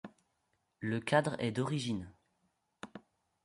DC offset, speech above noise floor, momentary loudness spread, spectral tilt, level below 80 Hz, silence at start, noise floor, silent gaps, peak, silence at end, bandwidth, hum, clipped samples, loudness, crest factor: under 0.1%; 46 dB; 23 LU; -6 dB/octave; -68 dBFS; 0.05 s; -80 dBFS; none; -16 dBFS; 0.45 s; 11.5 kHz; none; under 0.1%; -35 LUFS; 22 dB